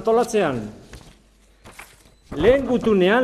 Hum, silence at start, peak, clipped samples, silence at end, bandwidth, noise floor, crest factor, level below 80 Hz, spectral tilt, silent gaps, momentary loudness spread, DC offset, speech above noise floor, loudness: none; 0 s; -4 dBFS; under 0.1%; 0 s; 13.5 kHz; -54 dBFS; 16 dB; -42 dBFS; -5.5 dB/octave; none; 19 LU; under 0.1%; 36 dB; -19 LUFS